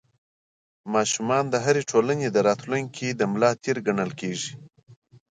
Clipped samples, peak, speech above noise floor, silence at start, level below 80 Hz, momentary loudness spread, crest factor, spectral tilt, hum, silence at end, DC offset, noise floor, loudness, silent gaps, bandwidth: under 0.1%; -6 dBFS; over 66 dB; 0.85 s; -68 dBFS; 8 LU; 20 dB; -4.5 dB/octave; none; 0.35 s; under 0.1%; under -90 dBFS; -24 LUFS; none; 9.6 kHz